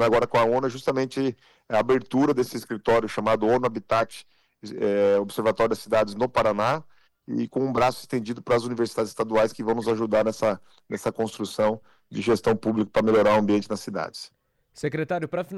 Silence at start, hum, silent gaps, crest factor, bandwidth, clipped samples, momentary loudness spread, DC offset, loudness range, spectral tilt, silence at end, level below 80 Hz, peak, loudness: 0 s; none; none; 10 dB; 14 kHz; under 0.1%; 10 LU; under 0.1%; 2 LU; -6 dB/octave; 0 s; -56 dBFS; -14 dBFS; -24 LUFS